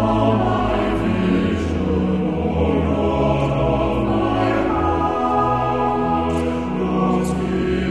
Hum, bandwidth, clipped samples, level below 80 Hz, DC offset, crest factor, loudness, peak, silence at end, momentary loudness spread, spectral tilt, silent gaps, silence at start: none; 12 kHz; under 0.1%; -32 dBFS; 0.6%; 12 dB; -19 LUFS; -6 dBFS; 0 s; 3 LU; -8 dB/octave; none; 0 s